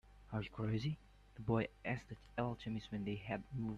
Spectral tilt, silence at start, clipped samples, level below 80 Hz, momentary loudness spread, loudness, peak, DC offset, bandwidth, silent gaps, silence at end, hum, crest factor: -8 dB/octave; 0.05 s; under 0.1%; -62 dBFS; 9 LU; -43 LUFS; -22 dBFS; under 0.1%; 7.6 kHz; none; 0 s; none; 20 dB